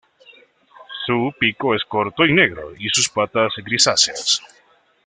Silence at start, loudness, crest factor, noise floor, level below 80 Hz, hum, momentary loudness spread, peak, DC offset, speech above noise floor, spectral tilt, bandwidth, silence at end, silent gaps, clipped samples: 0.8 s; -18 LUFS; 20 dB; -50 dBFS; -56 dBFS; none; 8 LU; 0 dBFS; under 0.1%; 31 dB; -2.5 dB/octave; 10 kHz; 0.6 s; none; under 0.1%